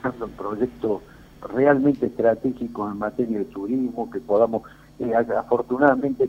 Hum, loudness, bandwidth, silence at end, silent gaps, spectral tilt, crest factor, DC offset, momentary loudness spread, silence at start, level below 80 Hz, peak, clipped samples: none; -23 LUFS; 15 kHz; 0 s; none; -9 dB/octave; 20 dB; under 0.1%; 12 LU; 0.05 s; -54 dBFS; -2 dBFS; under 0.1%